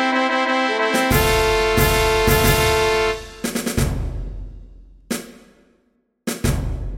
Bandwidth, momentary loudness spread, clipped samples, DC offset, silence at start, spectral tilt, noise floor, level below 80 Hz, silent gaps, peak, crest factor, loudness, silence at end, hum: 16.5 kHz; 14 LU; under 0.1%; under 0.1%; 0 s; -4 dB/octave; -65 dBFS; -28 dBFS; none; -2 dBFS; 18 dB; -19 LUFS; 0 s; none